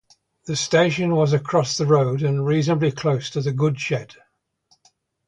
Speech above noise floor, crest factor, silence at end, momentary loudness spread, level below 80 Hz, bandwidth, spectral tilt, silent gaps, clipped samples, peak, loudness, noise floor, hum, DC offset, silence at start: 44 dB; 18 dB; 1.15 s; 7 LU; -58 dBFS; 9.4 kHz; -5.5 dB/octave; none; under 0.1%; -4 dBFS; -21 LUFS; -64 dBFS; none; under 0.1%; 0.45 s